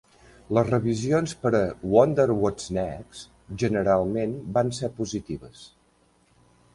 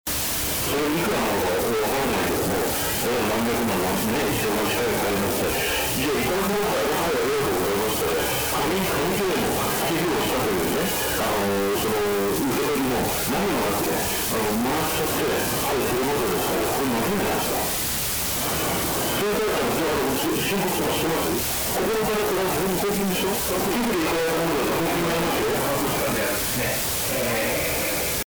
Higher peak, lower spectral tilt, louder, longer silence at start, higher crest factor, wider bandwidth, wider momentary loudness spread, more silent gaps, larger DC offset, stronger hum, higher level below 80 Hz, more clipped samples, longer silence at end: first, -4 dBFS vs -20 dBFS; first, -6.5 dB/octave vs -3.5 dB/octave; second, -25 LUFS vs -22 LUFS; first, 0.5 s vs 0.05 s; first, 22 dB vs 4 dB; second, 11.5 kHz vs over 20 kHz; first, 16 LU vs 0 LU; neither; neither; neither; second, -50 dBFS vs -42 dBFS; neither; first, 1.1 s vs 0.05 s